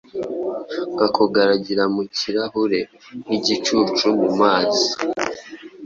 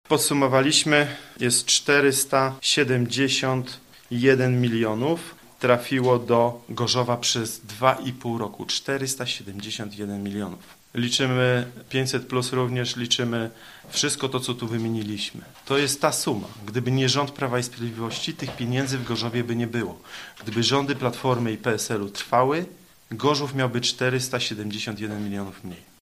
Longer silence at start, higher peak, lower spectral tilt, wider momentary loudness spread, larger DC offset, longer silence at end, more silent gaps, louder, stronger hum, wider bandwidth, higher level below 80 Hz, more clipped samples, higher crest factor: about the same, 0.15 s vs 0.1 s; about the same, -2 dBFS vs -2 dBFS; about the same, -4 dB/octave vs -4 dB/octave; about the same, 11 LU vs 12 LU; neither; second, 0 s vs 0.2 s; neither; first, -20 LUFS vs -24 LUFS; neither; second, 7.8 kHz vs 15.5 kHz; about the same, -60 dBFS vs -60 dBFS; neither; about the same, 18 dB vs 22 dB